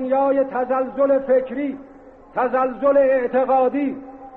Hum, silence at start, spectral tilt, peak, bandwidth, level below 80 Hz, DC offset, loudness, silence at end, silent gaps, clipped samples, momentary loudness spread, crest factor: none; 0 s; -5 dB/octave; -8 dBFS; 4 kHz; -56 dBFS; under 0.1%; -20 LUFS; 0 s; none; under 0.1%; 11 LU; 12 dB